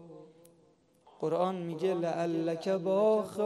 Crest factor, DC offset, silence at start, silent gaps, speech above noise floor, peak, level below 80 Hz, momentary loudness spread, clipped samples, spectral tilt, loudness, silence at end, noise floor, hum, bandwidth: 16 dB; under 0.1%; 0 s; none; 35 dB; -16 dBFS; -80 dBFS; 7 LU; under 0.1%; -7 dB/octave; -31 LUFS; 0 s; -66 dBFS; none; 13 kHz